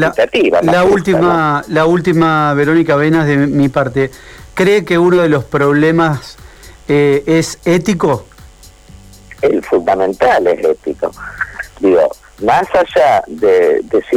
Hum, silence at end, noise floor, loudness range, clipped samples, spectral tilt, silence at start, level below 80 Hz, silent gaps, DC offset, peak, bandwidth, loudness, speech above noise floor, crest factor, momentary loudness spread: none; 0 s; -38 dBFS; 4 LU; under 0.1%; -6.5 dB/octave; 0 s; -42 dBFS; none; under 0.1%; -4 dBFS; 16 kHz; -12 LUFS; 27 dB; 8 dB; 9 LU